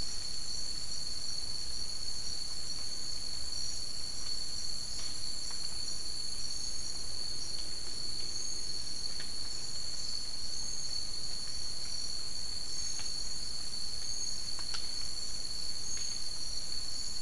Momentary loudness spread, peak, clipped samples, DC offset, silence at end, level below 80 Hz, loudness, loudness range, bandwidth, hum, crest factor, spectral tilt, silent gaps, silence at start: 2 LU; -20 dBFS; under 0.1%; 3%; 0 s; -50 dBFS; -37 LUFS; 1 LU; 12 kHz; none; 14 dB; -0.5 dB/octave; none; 0 s